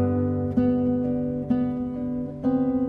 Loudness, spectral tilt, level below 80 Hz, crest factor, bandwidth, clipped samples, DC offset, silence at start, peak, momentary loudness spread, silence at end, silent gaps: -25 LUFS; -11.5 dB/octave; -48 dBFS; 14 dB; 3.2 kHz; under 0.1%; under 0.1%; 0 s; -10 dBFS; 6 LU; 0 s; none